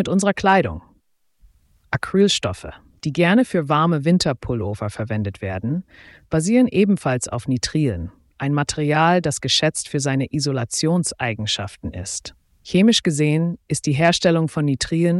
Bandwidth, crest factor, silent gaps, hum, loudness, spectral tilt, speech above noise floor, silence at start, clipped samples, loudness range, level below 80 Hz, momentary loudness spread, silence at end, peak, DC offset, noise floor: 12 kHz; 16 dB; none; none; -20 LUFS; -5 dB/octave; 42 dB; 0 s; under 0.1%; 2 LU; -46 dBFS; 12 LU; 0 s; -4 dBFS; under 0.1%; -61 dBFS